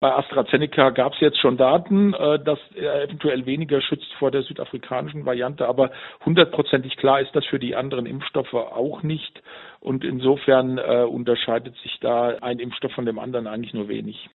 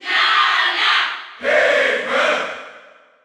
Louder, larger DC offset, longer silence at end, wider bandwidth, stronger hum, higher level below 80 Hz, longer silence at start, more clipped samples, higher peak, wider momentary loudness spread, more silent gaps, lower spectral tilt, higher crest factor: second, -22 LUFS vs -16 LUFS; neither; second, 0.15 s vs 0.45 s; second, 4.2 kHz vs 13.5 kHz; neither; first, -62 dBFS vs -68 dBFS; about the same, 0 s vs 0 s; neither; first, 0 dBFS vs -4 dBFS; about the same, 11 LU vs 10 LU; neither; first, -4 dB/octave vs -0.5 dB/octave; first, 22 dB vs 14 dB